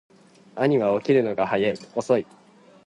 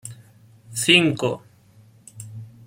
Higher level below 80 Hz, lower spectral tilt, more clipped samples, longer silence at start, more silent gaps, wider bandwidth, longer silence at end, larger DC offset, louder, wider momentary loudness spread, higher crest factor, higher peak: about the same, -66 dBFS vs -62 dBFS; first, -6.5 dB/octave vs -3.5 dB/octave; neither; first, 0.55 s vs 0.05 s; neither; second, 10.5 kHz vs 16.5 kHz; first, 0.65 s vs 0.2 s; neither; second, -23 LUFS vs -19 LUFS; second, 10 LU vs 24 LU; second, 18 dB vs 24 dB; second, -6 dBFS vs -2 dBFS